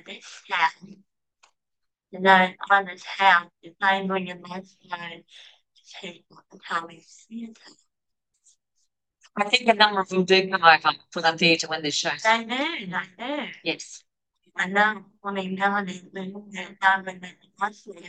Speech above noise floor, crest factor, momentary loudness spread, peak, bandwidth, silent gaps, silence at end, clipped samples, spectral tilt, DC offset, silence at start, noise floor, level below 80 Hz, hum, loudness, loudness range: 58 dB; 24 dB; 21 LU; 0 dBFS; 9.2 kHz; none; 0 s; under 0.1%; -3.5 dB/octave; under 0.1%; 0.1 s; -83 dBFS; -78 dBFS; none; -22 LUFS; 17 LU